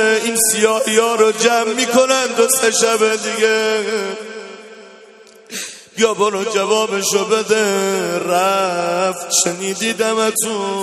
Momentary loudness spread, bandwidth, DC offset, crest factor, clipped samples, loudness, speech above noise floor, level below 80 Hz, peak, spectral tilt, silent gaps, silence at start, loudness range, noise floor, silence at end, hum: 13 LU; 13.5 kHz; under 0.1%; 16 dB; under 0.1%; -15 LUFS; 27 dB; -64 dBFS; 0 dBFS; -2 dB/octave; none; 0 s; 6 LU; -43 dBFS; 0 s; none